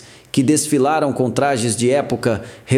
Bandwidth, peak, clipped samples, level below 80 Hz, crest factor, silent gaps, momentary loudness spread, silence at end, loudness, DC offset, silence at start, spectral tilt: 16 kHz; -2 dBFS; under 0.1%; -54 dBFS; 16 dB; none; 6 LU; 0 s; -18 LUFS; under 0.1%; 0.35 s; -5 dB/octave